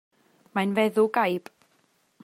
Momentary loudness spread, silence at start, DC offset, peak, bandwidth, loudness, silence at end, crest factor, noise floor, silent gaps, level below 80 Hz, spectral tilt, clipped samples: 10 LU; 0.55 s; under 0.1%; -8 dBFS; 16 kHz; -25 LUFS; 0.85 s; 18 dB; -67 dBFS; none; -78 dBFS; -6 dB/octave; under 0.1%